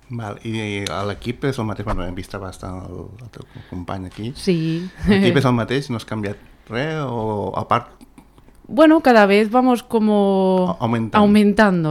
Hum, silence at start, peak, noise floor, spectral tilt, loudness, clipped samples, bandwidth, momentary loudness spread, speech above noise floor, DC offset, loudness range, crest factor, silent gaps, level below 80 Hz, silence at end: none; 0.1 s; 0 dBFS; -47 dBFS; -7 dB/octave; -18 LUFS; under 0.1%; 13 kHz; 18 LU; 29 dB; under 0.1%; 12 LU; 18 dB; none; -40 dBFS; 0 s